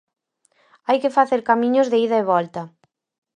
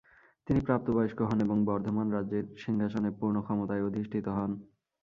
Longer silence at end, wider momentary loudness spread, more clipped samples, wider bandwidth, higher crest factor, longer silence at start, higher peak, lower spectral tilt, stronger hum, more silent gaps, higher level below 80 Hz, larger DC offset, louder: first, 0.7 s vs 0.4 s; first, 15 LU vs 6 LU; neither; first, 9.8 kHz vs 6.8 kHz; about the same, 18 dB vs 20 dB; first, 0.9 s vs 0.45 s; first, -2 dBFS vs -12 dBFS; second, -6 dB/octave vs -9.5 dB/octave; neither; neither; second, -70 dBFS vs -56 dBFS; neither; first, -19 LUFS vs -31 LUFS